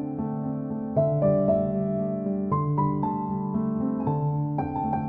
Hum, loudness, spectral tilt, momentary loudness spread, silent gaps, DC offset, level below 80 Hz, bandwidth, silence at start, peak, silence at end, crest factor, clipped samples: none; -26 LUFS; -13.5 dB/octave; 7 LU; none; under 0.1%; -52 dBFS; 2.7 kHz; 0 s; -10 dBFS; 0 s; 14 dB; under 0.1%